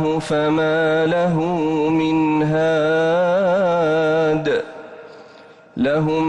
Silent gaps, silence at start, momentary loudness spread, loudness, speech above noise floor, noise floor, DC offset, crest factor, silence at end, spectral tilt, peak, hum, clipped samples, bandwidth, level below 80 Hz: none; 0 s; 6 LU; -18 LUFS; 27 dB; -44 dBFS; under 0.1%; 8 dB; 0 s; -7 dB/octave; -10 dBFS; none; under 0.1%; 10.5 kHz; -54 dBFS